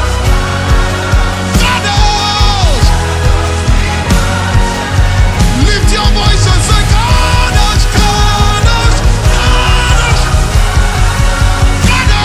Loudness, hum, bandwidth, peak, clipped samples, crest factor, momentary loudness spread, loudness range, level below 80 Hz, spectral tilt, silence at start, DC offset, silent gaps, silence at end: -10 LUFS; none; 14.5 kHz; 0 dBFS; 0.5%; 8 dB; 3 LU; 2 LU; -12 dBFS; -4 dB/octave; 0 s; under 0.1%; none; 0 s